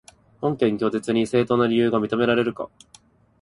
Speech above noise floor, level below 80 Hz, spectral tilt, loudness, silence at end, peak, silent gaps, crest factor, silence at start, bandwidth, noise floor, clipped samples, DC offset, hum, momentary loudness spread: 33 dB; -58 dBFS; -6.5 dB/octave; -22 LUFS; 0.75 s; -6 dBFS; none; 16 dB; 0.4 s; 11.5 kHz; -55 dBFS; under 0.1%; under 0.1%; none; 8 LU